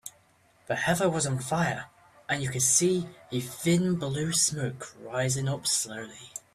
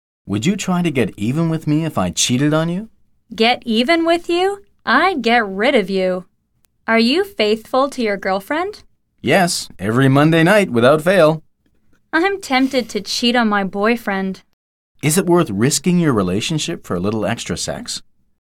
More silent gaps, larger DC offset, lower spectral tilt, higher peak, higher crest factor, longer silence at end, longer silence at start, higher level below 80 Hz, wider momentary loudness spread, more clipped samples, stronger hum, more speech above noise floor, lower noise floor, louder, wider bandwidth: second, none vs 14.53-14.95 s; neither; about the same, -3.5 dB/octave vs -4.5 dB/octave; second, -10 dBFS vs -2 dBFS; first, 20 dB vs 14 dB; second, 0.15 s vs 0.4 s; second, 0.05 s vs 0.25 s; second, -62 dBFS vs -50 dBFS; first, 17 LU vs 10 LU; neither; neither; second, 35 dB vs 46 dB; about the same, -63 dBFS vs -62 dBFS; second, -27 LUFS vs -17 LUFS; about the same, 15 kHz vs 16.5 kHz